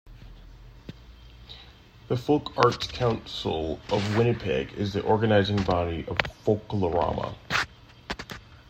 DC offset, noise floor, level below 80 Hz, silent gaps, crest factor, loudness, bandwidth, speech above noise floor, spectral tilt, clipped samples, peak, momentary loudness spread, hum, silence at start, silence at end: under 0.1%; -50 dBFS; -48 dBFS; none; 26 dB; -27 LUFS; 15.5 kHz; 24 dB; -6 dB/octave; under 0.1%; 0 dBFS; 23 LU; none; 0.05 s; 0.15 s